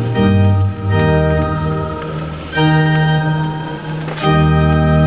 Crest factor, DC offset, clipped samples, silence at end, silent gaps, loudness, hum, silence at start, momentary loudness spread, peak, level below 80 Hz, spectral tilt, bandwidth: 12 dB; 0.4%; under 0.1%; 0 s; none; -15 LUFS; none; 0 s; 11 LU; -2 dBFS; -26 dBFS; -11.5 dB/octave; 4 kHz